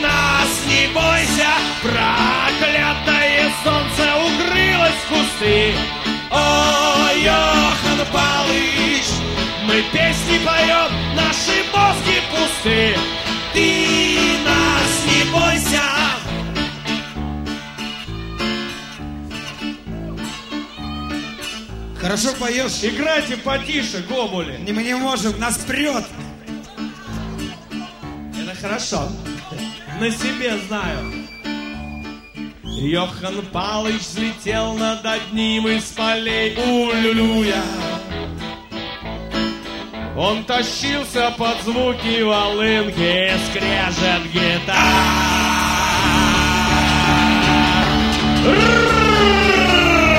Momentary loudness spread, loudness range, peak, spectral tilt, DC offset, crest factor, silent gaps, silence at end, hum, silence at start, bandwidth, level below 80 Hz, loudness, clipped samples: 15 LU; 11 LU; 0 dBFS; -3.5 dB/octave; under 0.1%; 18 dB; none; 0 s; none; 0 s; 16.5 kHz; -34 dBFS; -17 LUFS; under 0.1%